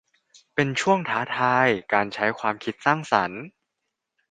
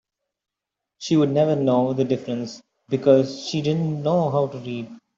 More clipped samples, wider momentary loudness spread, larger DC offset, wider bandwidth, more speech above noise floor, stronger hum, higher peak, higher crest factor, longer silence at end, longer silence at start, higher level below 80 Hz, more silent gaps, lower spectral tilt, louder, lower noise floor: neither; second, 7 LU vs 14 LU; neither; first, 9.6 kHz vs 7.8 kHz; second, 58 dB vs 64 dB; neither; about the same, -2 dBFS vs -4 dBFS; about the same, 22 dB vs 18 dB; first, 0.85 s vs 0.2 s; second, 0.55 s vs 1 s; about the same, -66 dBFS vs -64 dBFS; neither; second, -5 dB/octave vs -7 dB/octave; about the same, -23 LUFS vs -22 LUFS; second, -81 dBFS vs -85 dBFS